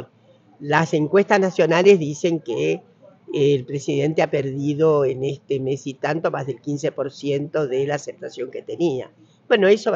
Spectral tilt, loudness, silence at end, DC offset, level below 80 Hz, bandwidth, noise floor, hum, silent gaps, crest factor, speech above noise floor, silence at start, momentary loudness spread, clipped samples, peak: -6 dB/octave; -21 LUFS; 0 s; under 0.1%; -68 dBFS; 7.6 kHz; -54 dBFS; none; none; 18 dB; 34 dB; 0 s; 13 LU; under 0.1%; -4 dBFS